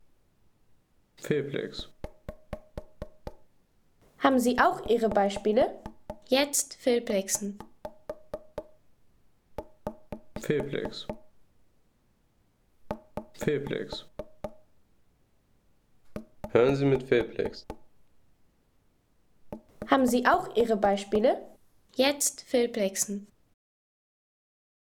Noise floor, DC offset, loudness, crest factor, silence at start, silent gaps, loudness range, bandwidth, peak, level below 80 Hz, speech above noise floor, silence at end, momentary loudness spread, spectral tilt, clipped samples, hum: -68 dBFS; under 0.1%; -27 LUFS; 24 dB; 1.2 s; none; 11 LU; 19 kHz; -8 dBFS; -54 dBFS; 41 dB; 1.6 s; 21 LU; -4 dB/octave; under 0.1%; none